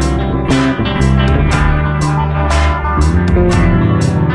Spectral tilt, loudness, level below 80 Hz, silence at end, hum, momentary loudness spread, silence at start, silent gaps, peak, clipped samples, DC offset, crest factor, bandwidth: -6.5 dB/octave; -13 LUFS; -18 dBFS; 0 s; none; 3 LU; 0 s; none; 0 dBFS; under 0.1%; under 0.1%; 10 dB; 11.5 kHz